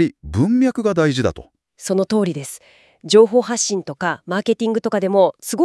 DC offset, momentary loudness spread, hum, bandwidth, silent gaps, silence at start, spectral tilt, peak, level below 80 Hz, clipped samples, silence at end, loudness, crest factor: under 0.1%; 9 LU; none; 12 kHz; none; 0 s; -5 dB/octave; 0 dBFS; -48 dBFS; under 0.1%; 0 s; -18 LUFS; 18 dB